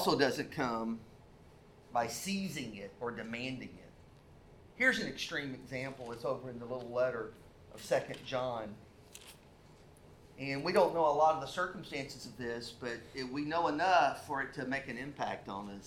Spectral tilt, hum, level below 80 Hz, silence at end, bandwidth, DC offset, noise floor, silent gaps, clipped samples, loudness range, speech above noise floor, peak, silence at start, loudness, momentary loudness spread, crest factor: -4.5 dB/octave; none; -64 dBFS; 0 s; 17.5 kHz; under 0.1%; -59 dBFS; none; under 0.1%; 7 LU; 23 dB; -16 dBFS; 0 s; -35 LUFS; 16 LU; 22 dB